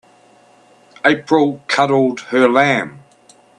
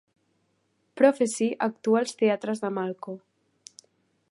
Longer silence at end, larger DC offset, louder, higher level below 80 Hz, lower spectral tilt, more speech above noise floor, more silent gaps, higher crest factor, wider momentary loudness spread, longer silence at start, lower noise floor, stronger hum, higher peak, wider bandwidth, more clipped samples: second, 0.65 s vs 1.15 s; neither; first, -15 LUFS vs -25 LUFS; first, -64 dBFS vs -82 dBFS; about the same, -5.5 dB/octave vs -5 dB/octave; second, 35 dB vs 47 dB; neither; about the same, 18 dB vs 22 dB; second, 5 LU vs 15 LU; about the same, 1.05 s vs 0.95 s; second, -49 dBFS vs -72 dBFS; neither; first, 0 dBFS vs -6 dBFS; about the same, 10.5 kHz vs 11.5 kHz; neither